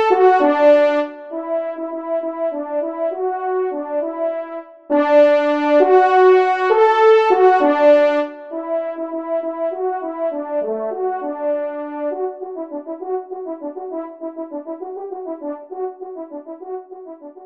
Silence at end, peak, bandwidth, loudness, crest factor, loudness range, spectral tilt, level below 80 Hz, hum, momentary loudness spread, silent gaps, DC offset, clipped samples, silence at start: 0 s; 0 dBFS; 7.4 kHz; -17 LUFS; 16 dB; 15 LU; -4.5 dB/octave; -72 dBFS; none; 17 LU; none; under 0.1%; under 0.1%; 0 s